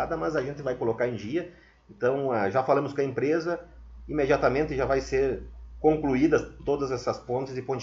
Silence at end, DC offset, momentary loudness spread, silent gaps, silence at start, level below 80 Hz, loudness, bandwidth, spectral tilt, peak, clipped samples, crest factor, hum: 0 s; under 0.1%; 9 LU; none; 0 s; -46 dBFS; -27 LUFS; 7.6 kHz; -7 dB/octave; -8 dBFS; under 0.1%; 18 dB; none